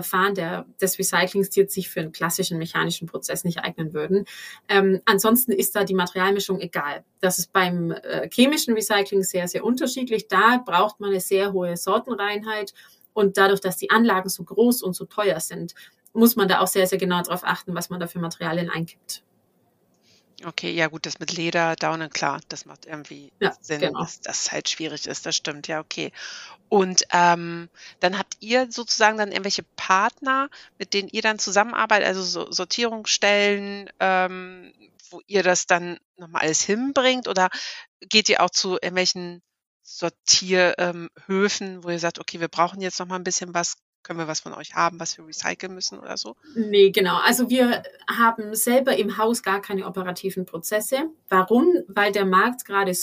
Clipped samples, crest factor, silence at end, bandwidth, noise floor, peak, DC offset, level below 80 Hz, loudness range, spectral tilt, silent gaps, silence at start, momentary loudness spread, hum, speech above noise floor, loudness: under 0.1%; 22 dB; 0 s; 15.5 kHz; -65 dBFS; -2 dBFS; under 0.1%; -70 dBFS; 6 LU; -3 dB/octave; 36.05-36.14 s, 37.88-38.00 s, 39.66-39.80 s, 43.82-44.03 s; 0 s; 13 LU; none; 42 dB; -22 LUFS